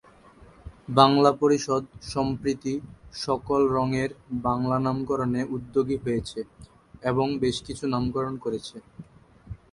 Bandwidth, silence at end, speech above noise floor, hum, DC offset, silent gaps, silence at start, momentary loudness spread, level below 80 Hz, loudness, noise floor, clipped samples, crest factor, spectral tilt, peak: 11.5 kHz; 0.15 s; 27 dB; none; under 0.1%; none; 0.4 s; 16 LU; -50 dBFS; -26 LUFS; -52 dBFS; under 0.1%; 26 dB; -6 dB/octave; -2 dBFS